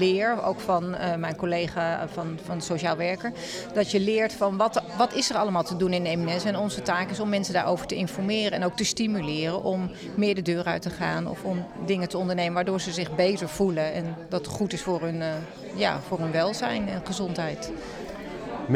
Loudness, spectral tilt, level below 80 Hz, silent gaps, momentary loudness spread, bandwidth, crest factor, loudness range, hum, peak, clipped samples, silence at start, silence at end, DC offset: -27 LUFS; -5 dB/octave; -56 dBFS; none; 8 LU; 15 kHz; 18 dB; 3 LU; none; -10 dBFS; under 0.1%; 0 s; 0 s; under 0.1%